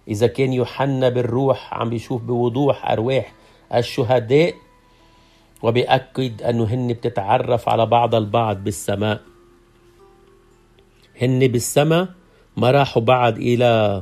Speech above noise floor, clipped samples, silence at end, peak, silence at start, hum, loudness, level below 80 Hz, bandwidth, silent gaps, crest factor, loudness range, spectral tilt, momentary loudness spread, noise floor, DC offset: 35 dB; under 0.1%; 0 s; -2 dBFS; 0.05 s; none; -19 LUFS; -54 dBFS; 14.5 kHz; none; 18 dB; 3 LU; -6 dB/octave; 8 LU; -53 dBFS; under 0.1%